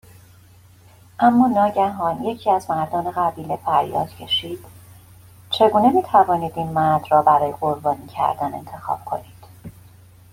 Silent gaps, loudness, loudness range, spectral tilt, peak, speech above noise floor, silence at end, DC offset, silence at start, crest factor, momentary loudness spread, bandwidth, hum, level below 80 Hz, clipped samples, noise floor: none; -20 LUFS; 5 LU; -6 dB/octave; -2 dBFS; 30 dB; 0.6 s; under 0.1%; 1.2 s; 18 dB; 12 LU; 16.5 kHz; none; -54 dBFS; under 0.1%; -49 dBFS